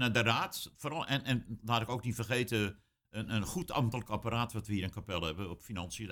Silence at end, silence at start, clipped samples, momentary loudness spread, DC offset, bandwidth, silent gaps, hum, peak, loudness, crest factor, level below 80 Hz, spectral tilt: 0 s; 0 s; under 0.1%; 9 LU; under 0.1%; 18.5 kHz; none; none; -14 dBFS; -35 LUFS; 22 dB; -56 dBFS; -5 dB/octave